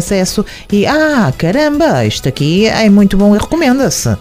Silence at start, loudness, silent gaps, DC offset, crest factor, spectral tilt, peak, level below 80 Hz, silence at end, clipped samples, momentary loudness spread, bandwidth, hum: 0 s; -11 LUFS; none; under 0.1%; 10 dB; -5 dB/octave; 0 dBFS; -30 dBFS; 0 s; under 0.1%; 6 LU; 16 kHz; none